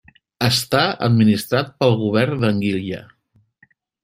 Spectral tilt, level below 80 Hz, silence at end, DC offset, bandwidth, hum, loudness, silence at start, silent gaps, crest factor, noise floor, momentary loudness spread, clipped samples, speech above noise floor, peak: -5.5 dB/octave; -54 dBFS; 1 s; under 0.1%; 16 kHz; none; -18 LUFS; 0.4 s; none; 18 dB; -58 dBFS; 7 LU; under 0.1%; 40 dB; -2 dBFS